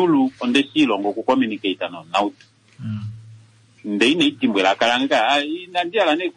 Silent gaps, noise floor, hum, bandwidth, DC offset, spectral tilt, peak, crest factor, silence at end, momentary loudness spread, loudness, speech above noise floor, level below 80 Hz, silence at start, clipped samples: none; -49 dBFS; none; 10.5 kHz; under 0.1%; -4.5 dB/octave; -6 dBFS; 14 dB; 0.05 s; 13 LU; -19 LUFS; 30 dB; -66 dBFS; 0 s; under 0.1%